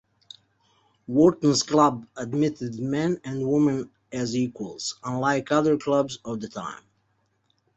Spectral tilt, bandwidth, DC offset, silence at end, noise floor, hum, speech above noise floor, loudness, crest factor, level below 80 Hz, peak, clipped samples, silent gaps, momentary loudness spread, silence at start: -5.5 dB/octave; 8.2 kHz; under 0.1%; 1 s; -70 dBFS; none; 46 dB; -24 LUFS; 20 dB; -62 dBFS; -4 dBFS; under 0.1%; none; 13 LU; 1.1 s